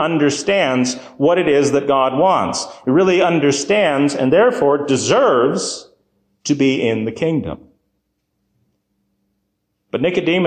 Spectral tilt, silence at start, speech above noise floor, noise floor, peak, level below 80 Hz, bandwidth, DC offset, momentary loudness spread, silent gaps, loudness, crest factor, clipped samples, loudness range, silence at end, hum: -4.5 dB/octave; 0 s; 55 dB; -71 dBFS; -4 dBFS; -54 dBFS; 9.8 kHz; under 0.1%; 9 LU; none; -16 LUFS; 12 dB; under 0.1%; 9 LU; 0 s; none